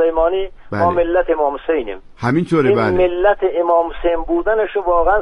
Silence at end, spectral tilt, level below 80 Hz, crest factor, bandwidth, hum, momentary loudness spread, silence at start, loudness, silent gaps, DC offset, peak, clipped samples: 0 s; -8 dB/octave; -32 dBFS; 14 dB; 11 kHz; none; 6 LU; 0 s; -17 LUFS; none; under 0.1%; -2 dBFS; under 0.1%